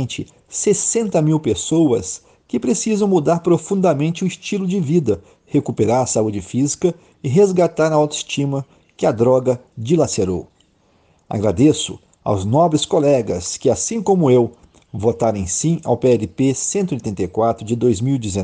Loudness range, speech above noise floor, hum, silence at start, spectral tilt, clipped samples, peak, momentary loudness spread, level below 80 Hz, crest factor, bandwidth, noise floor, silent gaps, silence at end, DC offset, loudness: 2 LU; 40 dB; none; 0 s; -5.5 dB/octave; under 0.1%; -2 dBFS; 8 LU; -50 dBFS; 14 dB; 10 kHz; -57 dBFS; none; 0 s; under 0.1%; -18 LUFS